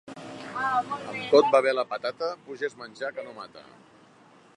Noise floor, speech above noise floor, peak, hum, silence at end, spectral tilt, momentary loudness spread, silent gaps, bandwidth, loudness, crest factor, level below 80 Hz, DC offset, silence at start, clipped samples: -56 dBFS; 29 dB; -6 dBFS; none; 0.95 s; -4.5 dB/octave; 20 LU; none; 11 kHz; -26 LUFS; 22 dB; -74 dBFS; under 0.1%; 0.05 s; under 0.1%